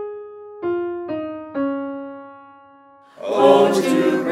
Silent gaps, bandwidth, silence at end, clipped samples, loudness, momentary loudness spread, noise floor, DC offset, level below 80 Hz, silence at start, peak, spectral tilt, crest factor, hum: none; 15.5 kHz; 0 s; under 0.1%; -19 LUFS; 21 LU; -48 dBFS; under 0.1%; -66 dBFS; 0 s; -2 dBFS; -5.5 dB/octave; 18 dB; none